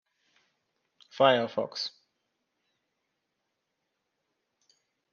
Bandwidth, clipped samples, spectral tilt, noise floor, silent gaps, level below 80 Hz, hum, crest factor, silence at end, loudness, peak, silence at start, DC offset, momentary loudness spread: 7 kHz; under 0.1%; -4.5 dB/octave; -82 dBFS; none; -84 dBFS; none; 26 dB; 3.25 s; -27 LUFS; -8 dBFS; 1.15 s; under 0.1%; 13 LU